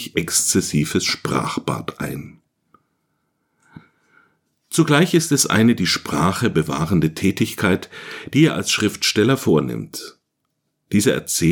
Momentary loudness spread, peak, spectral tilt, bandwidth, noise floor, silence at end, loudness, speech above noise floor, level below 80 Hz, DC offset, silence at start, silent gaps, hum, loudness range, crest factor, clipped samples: 13 LU; -2 dBFS; -4 dB/octave; 19 kHz; -74 dBFS; 0 s; -19 LUFS; 55 dB; -50 dBFS; under 0.1%; 0 s; none; none; 10 LU; 18 dB; under 0.1%